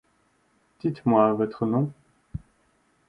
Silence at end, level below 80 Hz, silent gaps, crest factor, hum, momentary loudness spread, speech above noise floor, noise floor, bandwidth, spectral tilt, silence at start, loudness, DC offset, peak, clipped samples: 0.7 s; -56 dBFS; none; 22 dB; none; 20 LU; 44 dB; -67 dBFS; 5.2 kHz; -10.5 dB/octave; 0.85 s; -24 LUFS; under 0.1%; -6 dBFS; under 0.1%